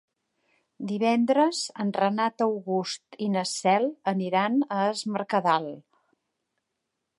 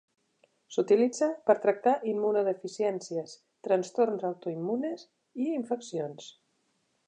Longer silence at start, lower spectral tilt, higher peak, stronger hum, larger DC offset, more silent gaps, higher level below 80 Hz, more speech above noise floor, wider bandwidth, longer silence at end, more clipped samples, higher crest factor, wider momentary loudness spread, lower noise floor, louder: about the same, 0.8 s vs 0.7 s; about the same, -5 dB/octave vs -5.5 dB/octave; about the same, -8 dBFS vs -8 dBFS; neither; neither; neither; first, -82 dBFS vs -88 dBFS; first, 56 dB vs 46 dB; first, 11.5 kHz vs 9.6 kHz; first, 1.4 s vs 0.8 s; neither; about the same, 18 dB vs 22 dB; second, 9 LU vs 15 LU; first, -82 dBFS vs -74 dBFS; first, -26 LUFS vs -29 LUFS